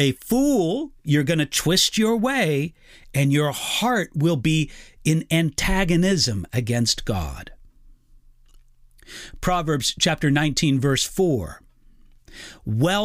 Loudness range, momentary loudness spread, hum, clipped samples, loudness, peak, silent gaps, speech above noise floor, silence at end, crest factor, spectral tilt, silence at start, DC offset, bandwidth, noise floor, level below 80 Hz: 6 LU; 10 LU; none; under 0.1%; -21 LUFS; -6 dBFS; none; 30 dB; 0 s; 16 dB; -4.5 dB/octave; 0 s; under 0.1%; 16 kHz; -52 dBFS; -38 dBFS